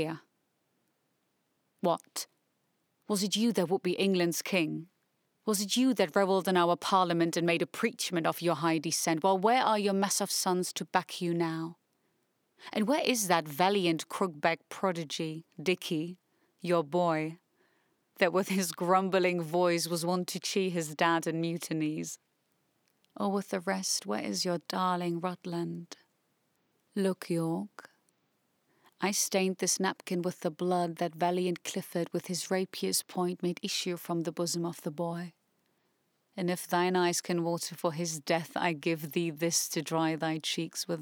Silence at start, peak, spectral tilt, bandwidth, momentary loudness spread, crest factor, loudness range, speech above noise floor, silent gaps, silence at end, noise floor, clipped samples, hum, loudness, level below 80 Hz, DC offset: 0 s; -10 dBFS; -4 dB/octave; over 20 kHz; 9 LU; 22 dB; 6 LU; 46 dB; none; 0 s; -77 dBFS; under 0.1%; none; -31 LUFS; under -90 dBFS; under 0.1%